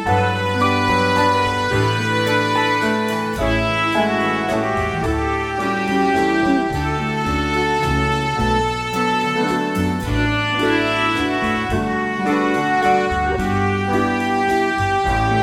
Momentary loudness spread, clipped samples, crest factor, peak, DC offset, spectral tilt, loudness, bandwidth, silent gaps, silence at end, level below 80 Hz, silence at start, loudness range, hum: 4 LU; under 0.1%; 14 dB; -4 dBFS; under 0.1%; -5.5 dB/octave; -18 LUFS; 17 kHz; none; 0 s; -34 dBFS; 0 s; 1 LU; none